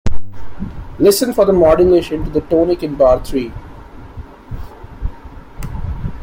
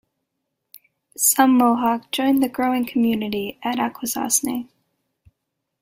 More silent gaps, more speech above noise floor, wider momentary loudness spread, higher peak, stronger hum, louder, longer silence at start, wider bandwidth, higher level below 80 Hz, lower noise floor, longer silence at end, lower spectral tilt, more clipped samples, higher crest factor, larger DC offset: neither; second, 21 dB vs 59 dB; first, 23 LU vs 11 LU; about the same, -2 dBFS vs -2 dBFS; neither; first, -14 LUFS vs -20 LUFS; second, 0.05 s vs 1.2 s; about the same, 16.5 kHz vs 16.5 kHz; first, -28 dBFS vs -62 dBFS; second, -34 dBFS vs -78 dBFS; second, 0 s vs 1.15 s; first, -6 dB/octave vs -2.5 dB/octave; neither; second, 14 dB vs 20 dB; neither